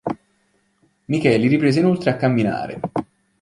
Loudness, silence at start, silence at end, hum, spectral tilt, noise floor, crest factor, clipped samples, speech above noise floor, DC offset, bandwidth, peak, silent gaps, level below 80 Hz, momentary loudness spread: -19 LUFS; 0.05 s; 0.4 s; none; -7.5 dB/octave; -64 dBFS; 18 dB; under 0.1%; 47 dB; under 0.1%; 11.5 kHz; -2 dBFS; none; -54 dBFS; 12 LU